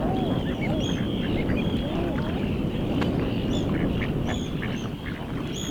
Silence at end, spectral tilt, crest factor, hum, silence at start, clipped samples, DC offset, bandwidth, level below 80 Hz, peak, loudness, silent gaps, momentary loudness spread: 0 s; -6.5 dB/octave; 14 dB; none; 0 s; under 0.1%; under 0.1%; over 20 kHz; -36 dBFS; -12 dBFS; -27 LUFS; none; 5 LU